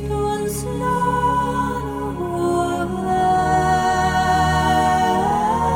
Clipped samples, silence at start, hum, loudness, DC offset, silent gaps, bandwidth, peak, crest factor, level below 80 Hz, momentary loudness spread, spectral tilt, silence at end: under 0.1%; 0 s; none; -19 LUFS; under 0.1%; none; 17 kHz; -6 dBFS; 12 dB; -34 dBFS; 7 LU; -5.5 dB/octave; 0 s